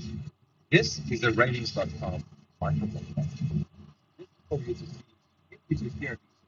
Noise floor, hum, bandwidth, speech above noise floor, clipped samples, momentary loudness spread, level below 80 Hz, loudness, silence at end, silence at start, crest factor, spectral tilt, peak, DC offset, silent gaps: -59 dBFS; none; 7.4 kHz; 30 dB; under 0.1%; 17 LU; -54 dBFS; -30 LUFS; 0.3 s; 0 s; 24 dB; -5 dB/octave; -6 dBFS; under 0.1%; none